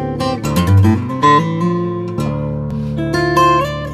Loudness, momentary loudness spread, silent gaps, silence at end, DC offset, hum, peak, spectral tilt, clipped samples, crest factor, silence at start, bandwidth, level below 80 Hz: -15 LUFS; 9 LU; none; 0 s; under 0.1%; none; 0 dBFS; -6.5 dB/octave; under 0.1%; 14 dB; 0 s; 15 kHz; -36 dBFS